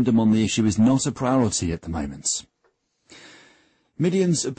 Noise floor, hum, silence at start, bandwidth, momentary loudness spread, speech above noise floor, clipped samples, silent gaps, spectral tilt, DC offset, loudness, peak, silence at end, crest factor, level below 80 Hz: -68 dBFS; none; 0 s; 8.8 kHz; 9 LU; 47 dB; under 0.1%; none; -5 dB/octave; under 0.1%; -22 LUFS; -10 dBFS; 0.05 s; 12 dB; -46 dBFS